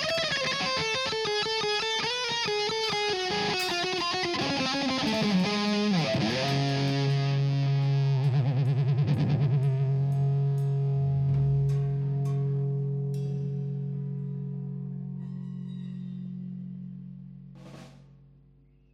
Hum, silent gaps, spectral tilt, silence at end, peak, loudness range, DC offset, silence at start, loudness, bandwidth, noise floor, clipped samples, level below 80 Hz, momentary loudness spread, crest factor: none; none; -5.5 dB/octave; 0.9 s; -14 dBFS; 12 LU; under 0.1%; 0 s; -27 LUFS; 11 kHz; -59 dBFS; under 0.1%; -56 dBFS; 12 LU; 14 dB